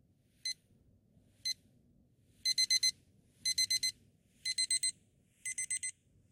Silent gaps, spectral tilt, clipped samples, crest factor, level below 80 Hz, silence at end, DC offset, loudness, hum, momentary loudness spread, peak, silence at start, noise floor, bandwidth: none; 3.5 dB/octave; under 0.1%; 18 dB; -76 dBFS; 0.4 s; under 0.1%; -34 LUFS; none; 14 LU; -20 dBFS; 0.45 s; -69 dBFS; 16.5 kHz